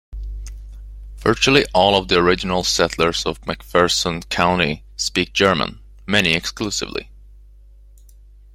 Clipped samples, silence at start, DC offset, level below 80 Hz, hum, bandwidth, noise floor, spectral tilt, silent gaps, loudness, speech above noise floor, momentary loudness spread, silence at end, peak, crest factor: under 0.1%; 0.1 s; under 0.1%; -36 dBFS; none; 16.5 kHz; -45 dBFS; -3.5 dB/octave; none; -18 LUFS; 27 dB; 19 LU; 1.4 s; 0 dBFS; 20 dB